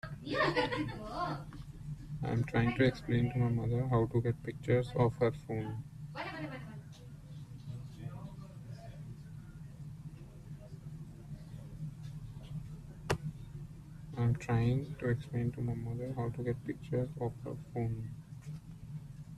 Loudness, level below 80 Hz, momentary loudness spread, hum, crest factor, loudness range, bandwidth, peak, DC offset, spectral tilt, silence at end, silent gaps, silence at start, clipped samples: -36 LUFS; -54 dBFS; 18 LU; none; 20 dB; 15 LU; 12 kHz; -16 dBFS; under 0.1%; -7.5 dB/octave; 0 s; none; 0.05 s; under 0.1%